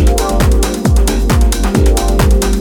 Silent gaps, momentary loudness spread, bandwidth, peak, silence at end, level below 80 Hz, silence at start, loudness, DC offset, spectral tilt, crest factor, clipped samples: none; 1 LU; 18 kHz; 0 dBFS; 0 s; -12 dBFS; 0 s; -12 LUFS; under 0.1%; -5.5 dB/octave; 10 dB; under 0.1%